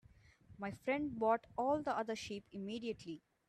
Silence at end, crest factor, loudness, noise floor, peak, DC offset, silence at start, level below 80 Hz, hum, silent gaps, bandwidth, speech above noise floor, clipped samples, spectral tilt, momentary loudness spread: 0.3 s; 18 dB; -40 LUFS; -64 dBFS; -22 dBFS; under 0.1%; 0.5 s; -70 dBFS; none; none; 13 kHz; 25 dB; under 0.1%; -5.5 dB/octave; 12 LU